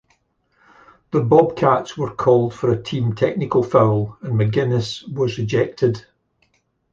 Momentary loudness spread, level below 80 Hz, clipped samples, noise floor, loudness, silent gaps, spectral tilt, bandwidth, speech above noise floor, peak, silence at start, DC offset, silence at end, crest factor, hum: 8 LU; -52 dBFS; under 0.1%; -64 dBFS; -19 LUFS; none; -7.5 dB/octave; 7.6 kHz; 46 dB; -2 dBFS; 1.15 s; under 0.1%; 0.95 s; 18 dB; none